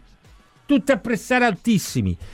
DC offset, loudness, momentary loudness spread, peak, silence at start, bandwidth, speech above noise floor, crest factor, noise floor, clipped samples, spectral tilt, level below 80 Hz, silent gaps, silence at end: under 0.1%; -20 LUFS; 5 LU; -4 dBFS; 0.7 s; 16.5 kHz; 32 dB; 18 dB; -52 dBFS; under 0.1%; -5.5 dB/octave; -46 dBFS; none; 0 s